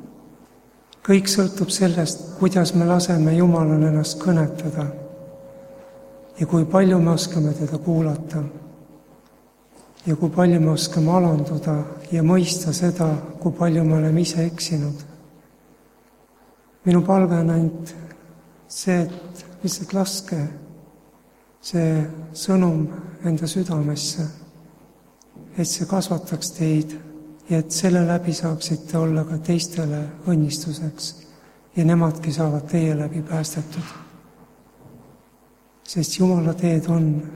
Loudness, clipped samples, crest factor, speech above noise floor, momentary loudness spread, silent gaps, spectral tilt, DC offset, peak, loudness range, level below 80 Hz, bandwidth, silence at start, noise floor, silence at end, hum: -21 LUFS; under 0.1%; 18 dB; 35 dB; 14 LU; none; -6 dB/octave; under 0.1%; -2 dBFS; 7 LU; -56 dBFS; 15 kHz; 0 s; -55 dBFS; 0 s; none